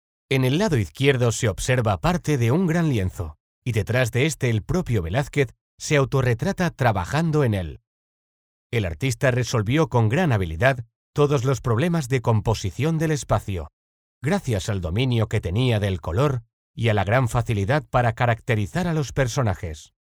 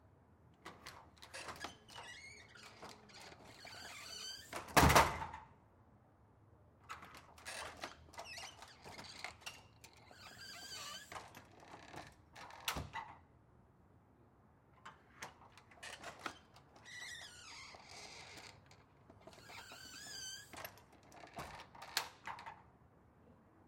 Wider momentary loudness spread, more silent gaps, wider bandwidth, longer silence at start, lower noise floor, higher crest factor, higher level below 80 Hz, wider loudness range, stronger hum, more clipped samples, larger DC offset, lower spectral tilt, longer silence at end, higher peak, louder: second, 7 LU vs 17 LU; first, 3.40-3.62 s, 5.61-5.78 s, 7.87-8.70 s, 10.96-11.13 s, 13.73-14.21 s, 16.53-16.74 s vs none; second, 14.5 kHz vs 16.5 kHz; first, 0.3 s vs 0.05 s; first, under -90 dBFS vs -68 dBFS; second, 20 dB vs 34 dB; first, -42 dBFS vs -60 dBFS; second, 3 LU vs 17 LU; neither; neither; neither; first, -6 dB/octave vs -3.5 dB/octave; first, 0.25 s vs 0 s; first, -4 dBFS vs -12 dBFS; first, -23 LUFS vs -43 LUFS